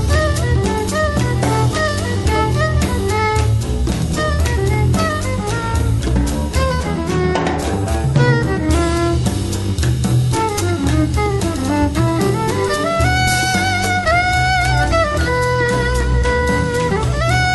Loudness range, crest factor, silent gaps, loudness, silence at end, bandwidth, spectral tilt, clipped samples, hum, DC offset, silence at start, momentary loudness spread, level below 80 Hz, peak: 2 LU; 14 dB; none; -16 LUFS; 0 s; 12 kHz; -5.5 dB/octave; under 0.1%; none; under 0.1%; 0 s; 4 LU; -24 dBFS; -2 dBFS